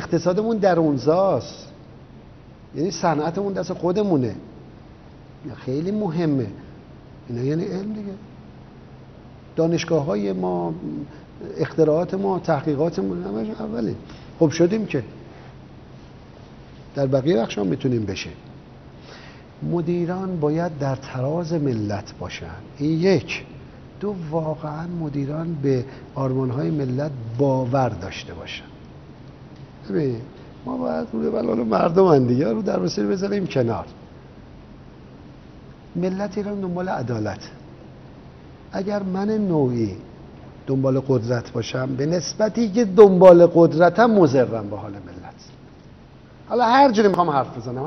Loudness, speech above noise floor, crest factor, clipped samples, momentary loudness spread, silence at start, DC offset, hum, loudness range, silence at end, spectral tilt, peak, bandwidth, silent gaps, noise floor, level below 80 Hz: -21 LUFS; 25 dB; 22 dB; under 0.1%; 22 LU; 0 s; under 0.1%; none; 12 LU; 0 s; -6.5 dB/octave; 0 dBFS; 6.4 kHz; none; -45 dBFS; -52 dBFS